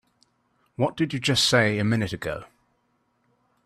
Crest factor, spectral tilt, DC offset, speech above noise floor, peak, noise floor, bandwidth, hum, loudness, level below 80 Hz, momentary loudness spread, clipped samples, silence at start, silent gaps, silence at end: 20 dB; -4.5 dB/octave; under 0.1%; 47 dB; -6 dBFS; -70 dBFS; 14.5 kHz; none; -23 LUFS; -56 dBFS; 14 LU; under 0.1%; 0.8 s; none; 1.2 s